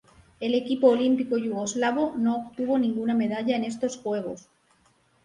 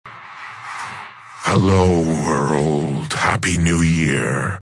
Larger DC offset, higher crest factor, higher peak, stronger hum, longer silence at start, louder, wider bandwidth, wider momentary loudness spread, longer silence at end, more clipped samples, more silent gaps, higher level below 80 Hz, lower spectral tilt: neither; about the same, 18 dB vs 18 dB; second, -8 dBFS vs -2 dBFS; neither; first, 0.4 s vs 0.05 s; second, -26 LUFS vs -17 LUFS; second, 10.5 kHz vs 12 kHz; second, 9 LU vs 18 LU; first, 0.85 s vs 0 s; neither; neither; second, -66 dBFS vs -42 dBFS; about the same, -5 dB/octave vs -5.5 dB/octave